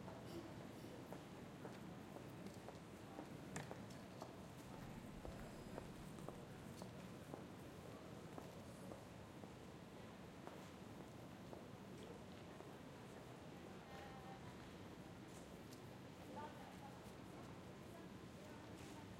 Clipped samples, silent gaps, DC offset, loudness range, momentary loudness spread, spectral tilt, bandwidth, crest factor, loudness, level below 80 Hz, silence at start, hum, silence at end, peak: under 0.1%; none; under 0.1%; 2 LU; 3 LU; -5.5 dB/octave; 16 kHz; 22 dB; -56 LUFS; -72 dBFS; 0 s; none; 0 s; -34 dBFS